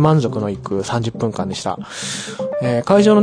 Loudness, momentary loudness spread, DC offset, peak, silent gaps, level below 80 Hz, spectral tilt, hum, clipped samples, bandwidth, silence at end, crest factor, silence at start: -19 LUFS; 11 LU; under 0.1%; -2 dBFS; none; -50 dBFS; -6 dB/octave; none; under 0.1%; 10.5 kHz; 0 s; 16 dB; 0 s